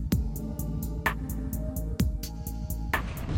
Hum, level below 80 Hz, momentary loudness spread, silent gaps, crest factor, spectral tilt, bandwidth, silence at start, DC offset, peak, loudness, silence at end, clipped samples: none; -34 dBFS; 5 LU; none; 16 dB; -5.5 dB/octave; 17 kHz; 0 s; under 0.1%; -14 dBFS; -32 LUFS; 0 s; under 0.1%